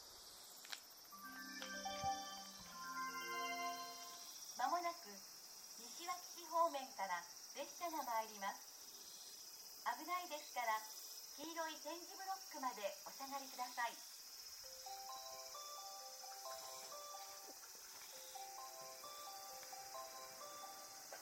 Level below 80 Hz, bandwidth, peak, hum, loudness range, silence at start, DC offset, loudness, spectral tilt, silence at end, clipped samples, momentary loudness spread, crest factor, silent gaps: -84 dBFS; 17 kHz; -26 dBFS; none; 7 LU; 0 s; under 0.1%; -48 LUFS; -0.5 dB/octave; 0 s; under 0.1%; 10 LU; 22 dB; none